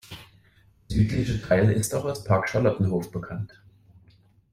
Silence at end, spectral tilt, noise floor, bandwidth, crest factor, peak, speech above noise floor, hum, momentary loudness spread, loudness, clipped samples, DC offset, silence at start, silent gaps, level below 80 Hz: 1.05 s; -6.5 dB/octave; -59 dBFS; 14.5 kHz; 20 dB; -6 dBFS; 35 dB; none; 15 LU; -25 LUFS; under 0.1%; under 0.1%; 0.1 s; none; -44 dBFS